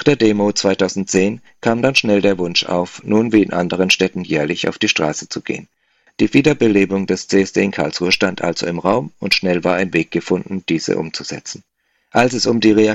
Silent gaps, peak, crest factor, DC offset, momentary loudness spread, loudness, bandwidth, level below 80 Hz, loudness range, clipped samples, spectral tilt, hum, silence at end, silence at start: none; 0 dBFS; 16 dB; under 0.1%; 8 LU; -16 LUFS; 13.5 kHz; -52 dBFS; 3 LU; under 0.1%; -4.5 dB/octave; none; 0 s; 0 s